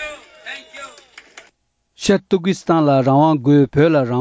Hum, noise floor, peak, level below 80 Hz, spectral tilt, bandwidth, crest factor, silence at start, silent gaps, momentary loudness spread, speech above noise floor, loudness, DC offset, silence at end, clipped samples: none; -63 dBFS; -2 dBFS; -50 dBFS; -7 dB/octave; 8 kHz; 14 dB; 0 s; none; 21 LU; 49 dB; -15 LUFS; under 0.1%; 0 s; under 0.1%